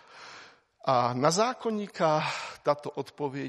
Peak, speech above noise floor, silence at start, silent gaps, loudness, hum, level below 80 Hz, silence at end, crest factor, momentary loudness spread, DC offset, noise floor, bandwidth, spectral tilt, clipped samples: -8 dBFS; 25 dB; 0.15 s; none; -28 LUFS; none; -74 dBFS; 0 s; 20 dB; 21 LU; under 0.1%; -53 dBFS; 12.5 kHz; -4.5 dB/octave; under 0.1%